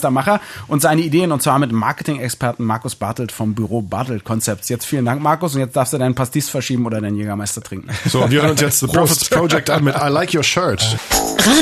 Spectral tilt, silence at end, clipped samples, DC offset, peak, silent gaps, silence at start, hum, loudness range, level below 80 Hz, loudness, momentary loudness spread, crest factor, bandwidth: -4.5 dB/octave; 0 s; under 0.1%; under 0.1%; 0 dBFS; none; 0 s; none; 5 LU; -44 dBFS; -17 LUFS; 8 LU; 16 dB; 14 kHz